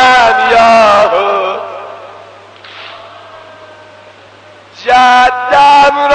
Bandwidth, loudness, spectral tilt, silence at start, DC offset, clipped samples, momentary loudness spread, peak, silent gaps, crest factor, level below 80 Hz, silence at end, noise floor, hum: 9.4 kHz; -7 LUFS; -2.5 dB/octave; 0 s; under 0.1%; under 0.1%; 23 LU; 0 dBFS; none; 10 dB; -44 dBFS; 0 s; -37 dBFS; none